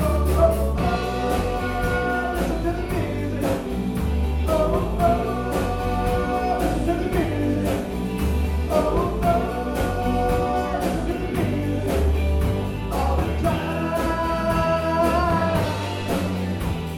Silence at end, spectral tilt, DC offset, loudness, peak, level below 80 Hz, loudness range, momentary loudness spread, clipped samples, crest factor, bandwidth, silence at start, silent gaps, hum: 0 s; -6.5 dB/octave; under 0.1%; -23 LUFS; -6 dBFS; -28 dBFS; 1 LU; 5 LU; under 0.1%; 16 dB; 17.5 kHz; 0 s; none; none